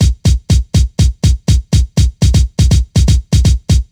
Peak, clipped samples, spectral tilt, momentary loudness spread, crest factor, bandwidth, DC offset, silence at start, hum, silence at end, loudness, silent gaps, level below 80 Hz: -2 dBFS; under 0.1%; -5.5 dB/octave; 3 LU; 8 dB; 13 kHz; under 0.1%; 0 s; none; 0.1 s; -13 LUFS; none; -14 dBFS